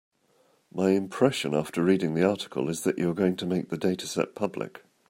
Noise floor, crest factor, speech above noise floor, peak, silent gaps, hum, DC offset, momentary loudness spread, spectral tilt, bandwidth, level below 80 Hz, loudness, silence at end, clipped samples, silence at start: -66 dBFS; 20 dB; 39 dB; -8 dBFS; none; none; under 0.1%; 7 LU; -6 dB/octave; 16 kHz; -68 dBFS; -27 LUFS; 0.3 s; under 0.1%; 0.75 s